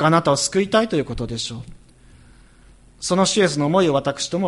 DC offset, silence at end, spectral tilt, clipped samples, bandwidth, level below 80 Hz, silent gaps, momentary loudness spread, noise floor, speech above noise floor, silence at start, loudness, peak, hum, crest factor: under 0.1%; 0 s; -4.5 dB/octave; under 0.1%; 11.5 kHz; -46 dBFS; none; 11 LU; -49 dBFS; 30 dB; 0 s; -20 LUFS; -2 dBFS; none; 18 dB